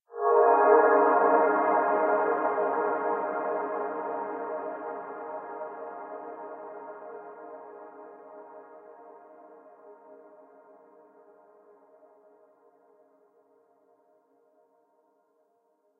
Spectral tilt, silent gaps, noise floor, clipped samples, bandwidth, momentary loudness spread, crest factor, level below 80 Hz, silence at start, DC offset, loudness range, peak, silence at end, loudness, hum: -5 dB/octave; none; -70 dBFS; under 0.1%; 3.3 kHz; 26 LU; 22 dB; under -90 dBFS; 0.1 s; under 0.1%; 26 LU; -6 dBFS; 5.85 s; -26 LUFS; none